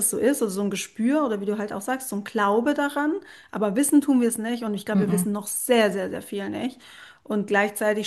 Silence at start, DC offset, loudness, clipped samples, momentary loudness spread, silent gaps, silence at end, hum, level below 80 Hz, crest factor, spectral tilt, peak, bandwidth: 0 s; under 0.1%; -24 LUFS; under 0.1%; 10 LU; none; 0 s; none; -68 dBFS; 18 dB; -4.5 dB/octave; -6 dBFS; 13 kHz